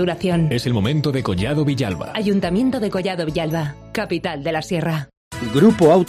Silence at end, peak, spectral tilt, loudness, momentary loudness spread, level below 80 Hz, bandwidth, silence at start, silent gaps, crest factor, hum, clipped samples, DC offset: 0 s; -2 dBFS; -7 dB/octave; -20 LUFS; 9 LU; -44 dBFS; 15 kHz; 0 s; 5.17-5.31 s; 16 dB; none; under 0.1%; under 0.1%